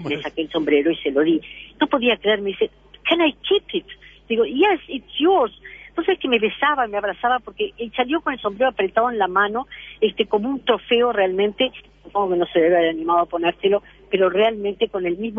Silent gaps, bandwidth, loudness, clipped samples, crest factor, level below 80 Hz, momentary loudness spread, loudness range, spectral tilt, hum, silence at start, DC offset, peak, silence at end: none; 5 kHz; -20 LUFS; under 0.1%; 16 dB; -54 dBFS; 8 LU; 2 LU; -7 dB/octave; none; 0 s; under 0.1%; -4 dBFS; 0 s